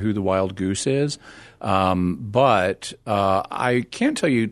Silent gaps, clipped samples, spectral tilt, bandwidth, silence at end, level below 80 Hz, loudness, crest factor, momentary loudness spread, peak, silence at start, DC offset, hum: none; under 0.1%; -5.5 dB/octave; 12.5 kHz; 0 s; -54 dBFS; -21 LUFS; 18 dB; 7 LU; -4 dBFS; 0 s; under 0.1%; none